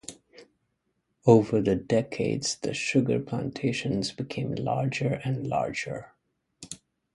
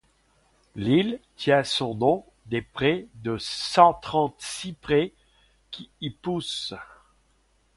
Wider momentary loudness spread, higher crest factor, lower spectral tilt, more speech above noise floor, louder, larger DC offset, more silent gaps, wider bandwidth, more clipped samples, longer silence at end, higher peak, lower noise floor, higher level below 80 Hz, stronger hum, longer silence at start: about the same, 17 LU vs 16 LU; about the same, 22 dB vs 24 dB; about the same, -5.5 dB/octave vs -5 dB/octave; first, 50 dB vs 41 dB; about the same, -27 LUFS vs -25 LUFS; neither; neither; about the same, 11.5 kHz vs 11.5 kHz; neither; second, 0.4 s vs 0.9 s; second, -6 dBFS vs -2 dBFS; first, -77 dBFS vs -65 dBFS; about the same, -58 dBFS vs -56 dBFS; neither; second, 0.1 s vs 0.75 s